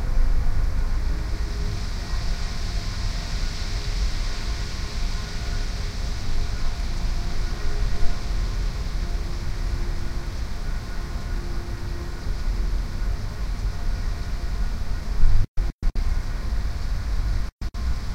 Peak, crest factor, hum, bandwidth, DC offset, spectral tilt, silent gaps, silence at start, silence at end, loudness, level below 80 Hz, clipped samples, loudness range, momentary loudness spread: -4 dBFS; 18 dB; none; 9.8 kHz; under 0.1%; -5 dB/octave; 15.48-15.55 s, 15.73-15.79 s, 17.52-17.59 s; 0 s; 0 s; -30 LUFS; -24 dBFS; under 0.1%; 2 LU; 5 LU